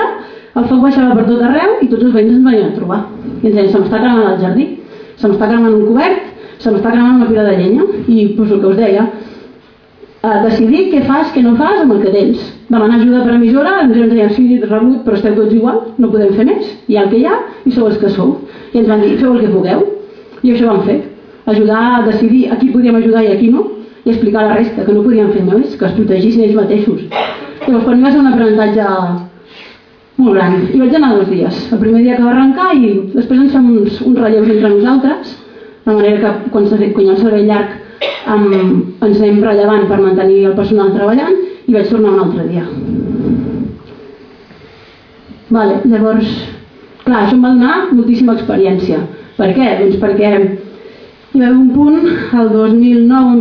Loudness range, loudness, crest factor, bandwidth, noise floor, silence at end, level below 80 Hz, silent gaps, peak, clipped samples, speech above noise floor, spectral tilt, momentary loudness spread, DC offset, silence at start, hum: 3 LU; -10 LUFS; 10 dB; 5.4 kHz; -41 dBFS; 0 s; -44 dBFS; none; 0 dBFS; under 0.1%; 32 dB; -9.5 dB/octave; 9 LU; under 0.1%; 0 s; none